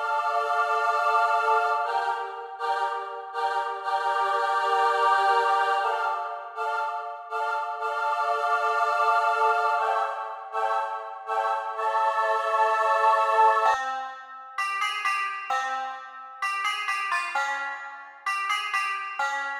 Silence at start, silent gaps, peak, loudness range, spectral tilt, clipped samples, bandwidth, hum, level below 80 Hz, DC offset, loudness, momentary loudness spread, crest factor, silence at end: 0 s; none; -8 dBFS; 4 LU; 1 dB/octave; under 0.1%; 14 kHz; none; -80 dBFS; under 0.1%; -25 LUFS; 11 LU; 16 dB; 0 s